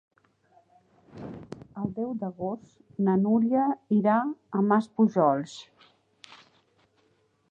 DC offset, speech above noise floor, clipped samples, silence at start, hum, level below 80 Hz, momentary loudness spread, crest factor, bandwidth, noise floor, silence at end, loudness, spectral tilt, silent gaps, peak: under 0.1%; 43 dB; under 0.1%; 1.15 s; none; -68 dBFS; 20 LU; 18 dB; 8 kHz; -68 dBFS; 1.15 s; -26 LUFS; -8.5 dB/octave; none; -10 dBFS